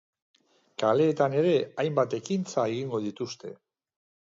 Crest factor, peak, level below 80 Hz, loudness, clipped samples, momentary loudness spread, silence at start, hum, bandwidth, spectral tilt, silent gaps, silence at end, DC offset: 18 dB; -10 dBFS; -76 dBFS; -27 LUFS; under 0.1%; 13 LU; 0.8 s; none; 7.8 kHz; -6 dB/octave; none; 0.7 s; under 0.1%